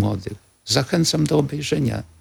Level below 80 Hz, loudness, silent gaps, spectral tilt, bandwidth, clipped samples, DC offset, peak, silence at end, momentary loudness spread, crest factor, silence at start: -48 dBFS; -21 LUFS; none; -5 dB/octave; 17 kHz; under 0.1%; under 0.1%; -4 dBFS; 0.15 s; 13 LU; 18 dB; 0 s